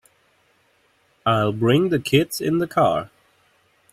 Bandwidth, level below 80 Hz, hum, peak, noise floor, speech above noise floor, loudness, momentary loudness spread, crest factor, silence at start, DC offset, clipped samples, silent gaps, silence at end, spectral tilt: 16 kHz; -56 dBFS; none; -4 dBFS; -62 dBFS; 43 dB; -20 LUFS; 7 LU; 18 dB; 1.25 s; under 0.1%; under 0.1%; none; 0.85 s; -6 dB/octave